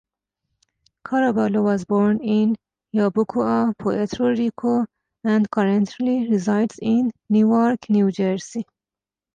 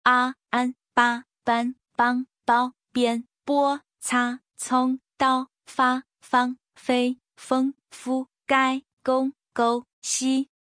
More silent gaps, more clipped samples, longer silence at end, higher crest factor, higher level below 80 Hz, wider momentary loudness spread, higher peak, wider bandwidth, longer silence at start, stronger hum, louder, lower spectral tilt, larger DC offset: second, none vs 8.93-8.97 s, 9.93-10.02 s; neither; first, 0.7 s vs 0.3 s; second, 12 dB vs 20 dB; first, -60 dBFS vs -72 dBFS; about the same, 8 LU vs 7 LU; second, -10 dBFS vs -6 dBFS; second, 9 kHz vs 10.5 kHz; first, 1.05 s vs 0.05 s; neither; first, -21 LUFS vs -25 LUFS; first, -7.5 dB/octave vs -2 dB/octave; neither